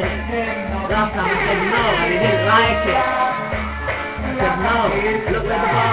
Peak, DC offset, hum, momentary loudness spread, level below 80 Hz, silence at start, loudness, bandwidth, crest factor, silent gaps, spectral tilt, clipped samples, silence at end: -2 dBFS; under 0.1%; none; 9 LU; -32 dBFS; 0 s; -18 LUFS; 5.2 kHz; 16 dB; none; -10 dB/octave; under 0.1%; 0 s